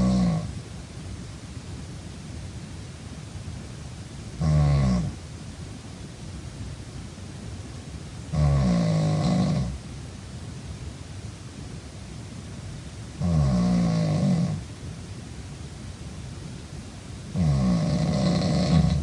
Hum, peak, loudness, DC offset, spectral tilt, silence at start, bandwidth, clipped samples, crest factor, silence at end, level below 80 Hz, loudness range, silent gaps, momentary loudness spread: none; -8 dBFS; -26 LUFS; under 0.1%; -7 dB/octave; 0 s; 11.5 kHz; under 0.1%; 20 dB; 0 s; -38 dBFS; 12 LU; none; 17 LU